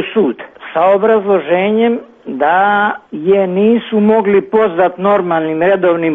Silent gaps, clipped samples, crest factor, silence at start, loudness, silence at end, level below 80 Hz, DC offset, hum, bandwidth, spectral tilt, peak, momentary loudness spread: none; under 0.1%; 10 dB; 0 s; -12 LUFS; 0 s; -56 dBFS; under 0.1%; none; 3.9 kHz; -9 dB/octave; -2 dBFS; 6 LU